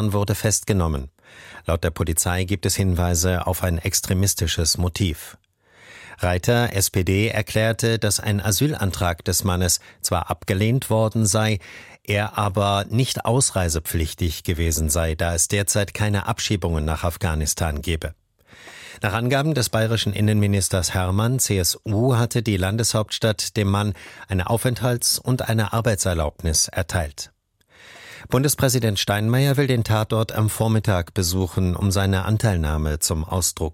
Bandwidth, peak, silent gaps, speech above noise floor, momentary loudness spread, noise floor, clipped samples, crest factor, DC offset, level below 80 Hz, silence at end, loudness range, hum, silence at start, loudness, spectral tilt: 16.5 kHz; -4 dBFS; none; 34 dB; 6 LU; -55 dBFS; under 0.1%; 16 dB; under 0.1%; -36 dBFS; 0 s; 2 LU; none; 0 s; -21 LUFS; -4.5 dB/octave